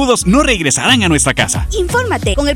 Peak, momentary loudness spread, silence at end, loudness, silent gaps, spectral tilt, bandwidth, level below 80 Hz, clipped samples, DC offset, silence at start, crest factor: 0 dBFS; 5 LU; 0 s; -12 LUFS; none; -3.5 dB/octave; 17.5 kHz; -24 dBFS; under 0.1%; under 0.1%; 0 s; 12 dB